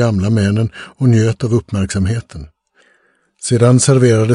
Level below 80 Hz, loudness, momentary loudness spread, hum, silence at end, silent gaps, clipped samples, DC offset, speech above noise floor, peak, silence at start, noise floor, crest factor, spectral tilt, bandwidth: -42 dBFS; -14 LUFS; 13 LU; none; 0 s; none; under 0.1%; under 0.1%; 44 dB; 0 dBFS; 0 s; -57 dBFS; 14 dB; -6 dB/octave; 11 kHz